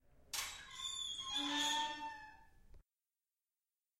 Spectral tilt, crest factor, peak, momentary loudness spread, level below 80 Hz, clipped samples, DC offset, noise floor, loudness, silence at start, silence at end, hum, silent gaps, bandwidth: 0 dB/octave; 18 dB; -26 dBFS; 13 LU; -70 dBFS; under 0.1%; under 0.1%; under -90 dBFS; -40 LUFS; 0.15 s; 1.2 s; none; none; 16 kHz